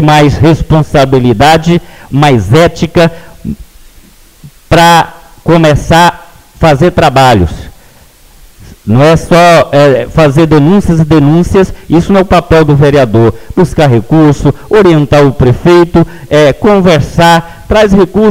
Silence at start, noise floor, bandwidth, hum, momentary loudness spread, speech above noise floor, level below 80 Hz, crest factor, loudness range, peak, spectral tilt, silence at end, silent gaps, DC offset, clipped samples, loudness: 0 s; -38 dBFS; 16 kHz; none; 6 LU; 33 dB; -24 dBFS; 6 dB; 3 LU; 0 dBFS; -6.5 dB/octave; 0 s; none; under 0.1%; 1%; -6 LUFS